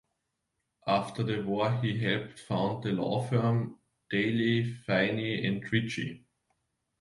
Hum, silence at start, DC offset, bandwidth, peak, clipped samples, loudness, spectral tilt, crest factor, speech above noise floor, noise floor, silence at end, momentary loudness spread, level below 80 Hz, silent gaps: none; 0.85 s; under 0.1%; 11.5 kHz; -12 dBFS; under 0.1%; -30 LUFS; -7 dB/octave; 18 dB; 53 dB; -82 dBFS; 0.85 s; 7 LU; -64 dBFS; none